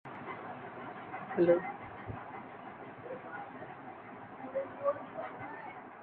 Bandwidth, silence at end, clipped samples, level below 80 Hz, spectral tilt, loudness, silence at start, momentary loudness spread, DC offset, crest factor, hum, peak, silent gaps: 4.4 kHz; 0 s; under 0.1%; -68 dBFS; -6 dB/octave; -38 LUFS; 0.05 s; 17 LU; under 0.1%; 24 dB; none; -14 dBFS; none